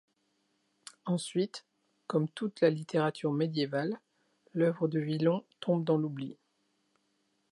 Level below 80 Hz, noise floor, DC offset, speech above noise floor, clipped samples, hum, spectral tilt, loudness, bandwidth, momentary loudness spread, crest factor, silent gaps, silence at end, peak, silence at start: -84 dBFS; -76 dBFS; under 0.1%; 45 dB; under 0.1%; none; -7 dB/octave; -32 LUFS; 11.5 kHz; 15 LU; 20 dB; none; 1.2 s; -14 dBFS; 1.05 s